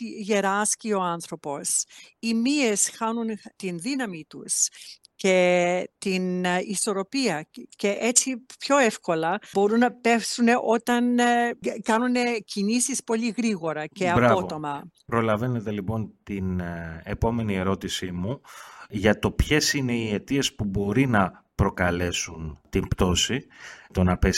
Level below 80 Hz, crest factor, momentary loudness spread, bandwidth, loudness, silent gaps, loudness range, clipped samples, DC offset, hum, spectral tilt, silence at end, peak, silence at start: -42 dBFS; 22 dB; 12 LU; 16 kHz; -24 LUFS; none; 5 LU; under 0.1%; under 0.1%; none; -4 dB/octave; 0 s; -4 dBFS; 0 s